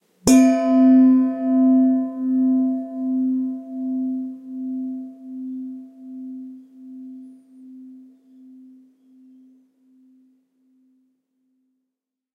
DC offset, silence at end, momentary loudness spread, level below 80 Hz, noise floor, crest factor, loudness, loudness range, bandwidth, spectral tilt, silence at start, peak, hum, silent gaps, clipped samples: under 0.1%; 4.35 s; 24 LU; -58 dBFS; -83 dBFS; 18 dB; -19 LUFS; 24 LU; 12.5 kHz; -5 dB/octave; 0.25 s; -4 dBFS; none; none; under 0.1%